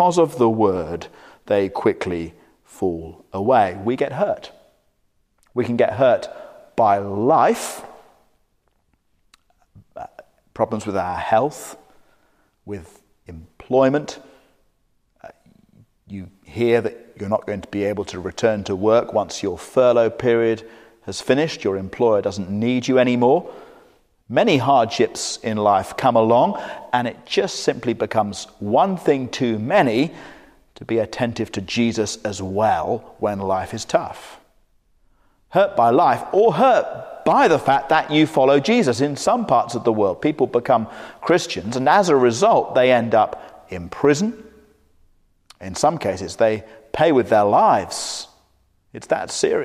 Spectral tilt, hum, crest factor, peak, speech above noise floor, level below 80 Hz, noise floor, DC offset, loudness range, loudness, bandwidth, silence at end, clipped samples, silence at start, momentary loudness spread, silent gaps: -5 dB/octave; none; 18 dB; -2 dBFS; 47 dB; -58 dBFS; -65 dBFS; under 0.1%; 8 LU; -19 LUFS; 15.5 kHz; 0 s; under 0.1%; 0 s; 17 LU; none